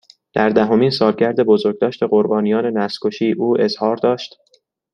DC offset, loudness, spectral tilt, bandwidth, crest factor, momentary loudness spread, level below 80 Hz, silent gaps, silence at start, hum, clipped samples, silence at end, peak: under 0.1%; -17 LUFS; -7 dB/octave; 9.6 kHz; 16 dB; 6 LU; -60 dBFS; none; 0.35 s; none; under 0.1%; 0.65 s; 0 dBFS